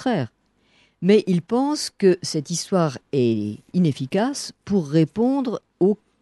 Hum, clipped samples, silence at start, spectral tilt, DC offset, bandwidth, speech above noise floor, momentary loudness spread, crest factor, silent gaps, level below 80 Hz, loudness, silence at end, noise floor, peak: none; under 0.1%; 0 s; -6 dB/octave; under 0.1%; 12 kHz; 40 dB; 7 LU; 16 dB; none; -64 dBFS; -22 LUFS; 0.25 s; -61 dBFS; -6 dBFS